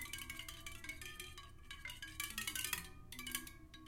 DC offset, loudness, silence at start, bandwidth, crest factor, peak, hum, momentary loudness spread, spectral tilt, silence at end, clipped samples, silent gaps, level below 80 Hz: under 0.1%; -46 LUFS; 0 s; 17 kHz; 28 dB; -22 dBFS; none; 12 LU; -1 dB/octave; 0 s; under 0.1%; none; -60 dBFS